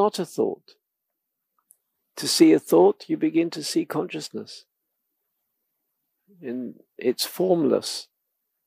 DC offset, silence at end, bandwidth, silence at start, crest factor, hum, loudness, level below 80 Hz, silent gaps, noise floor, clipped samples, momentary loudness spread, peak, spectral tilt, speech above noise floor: under 0.1%; 0.65 s; 15.5 kHz; 0 s; 22 dB; none; -23 LUFS; -84 dBFS; none; -82 dBFS; under 0.1%; 21 LU; -4 dBFS; -4.5 dB/octave; 59 dB